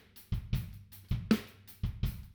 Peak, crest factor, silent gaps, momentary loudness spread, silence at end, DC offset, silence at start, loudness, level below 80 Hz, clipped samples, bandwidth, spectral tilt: -14 dBFS; 22 dB; none; 15 LU; 0 s; under 0.1%; 0.15 s; -37 LUFS; -42 dBFS; under 0.1%; over 20 kHz; -7 dB/octave